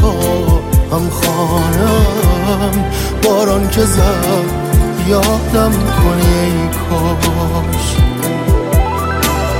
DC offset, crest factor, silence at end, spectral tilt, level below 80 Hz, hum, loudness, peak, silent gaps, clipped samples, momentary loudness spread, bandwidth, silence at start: under 0.1%; 12 dB; 0 s; -5.5 dB/octave; -18 dBFS; none; -13 LUFS; 0 dBFS; none; under 0.1%; 4 LU; 17 kHz; 0 s